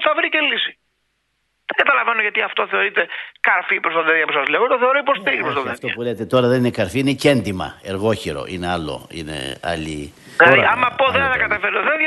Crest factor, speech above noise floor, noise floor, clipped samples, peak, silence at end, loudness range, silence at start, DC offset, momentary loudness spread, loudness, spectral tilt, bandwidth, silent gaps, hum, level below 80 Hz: 18 dB; 50 dB; -69 dBFS; under 0.1%; 0 dBFS; 0 s; 4 LU; 0 s; under 0.1%; 11 LU; -17 LUFS; -5 dB/octave; 12 kHz; none; none; -48 dBFS